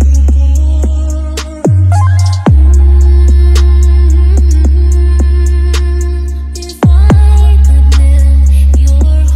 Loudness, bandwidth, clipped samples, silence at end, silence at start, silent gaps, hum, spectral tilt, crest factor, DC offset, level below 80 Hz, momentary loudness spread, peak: -8 LUFS; 10 kHz; under 0.1%; 0 s; 0 s; none; none; -7 dB/octave; 6 dB; under 0.1%; -6 dBFS; 8 LU; 0 dBFS